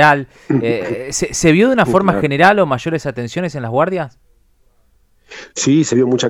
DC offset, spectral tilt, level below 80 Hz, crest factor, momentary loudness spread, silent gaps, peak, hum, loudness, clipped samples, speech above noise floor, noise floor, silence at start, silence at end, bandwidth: under 0.1%; -5 dB/octave; -44 dBFS; 16 dB; 11 LU; none; 0 dBFS; none; -15 LUFS; under 0.1%; 40 dB; -54 dBFS; 0 s; 0 s; 15.5 kHz